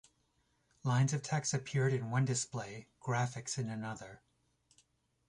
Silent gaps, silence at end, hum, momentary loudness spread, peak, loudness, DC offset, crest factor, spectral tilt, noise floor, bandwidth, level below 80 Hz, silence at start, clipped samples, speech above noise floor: none; 1.1 s; none; 12 LU; -20 dBFS; -36 LUFS; under 0.1%; 16 dB; -5 dB/octave; -76 dBFS; 11.5 kHz; -70 dBFS; 0.85 s; under 0.1%; 41 dB